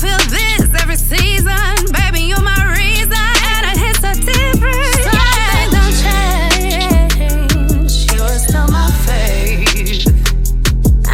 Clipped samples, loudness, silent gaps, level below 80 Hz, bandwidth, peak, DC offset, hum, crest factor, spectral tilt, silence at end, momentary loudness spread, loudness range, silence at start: under 0.1%; -13 LUFS; none; -12 dBFS; 16.5 kHz; 0 dBFS; under 0.1%; none; 10 dB; -3.5 dB/octave; 0 s; 3 LU; 1 LU; 0 s